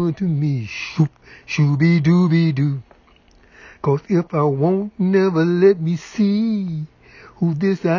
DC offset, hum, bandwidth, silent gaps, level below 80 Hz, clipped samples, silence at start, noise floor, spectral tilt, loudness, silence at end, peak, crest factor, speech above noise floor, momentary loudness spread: under 0.1%; none; 7 kHz; none; -54 dBFS; under 0.1%; 0 s; -52 dBFS; -8.5 dB/octave; -18 LUFS; 0 s; -2 dBFS; 16 dB; 34 dB; 10 LU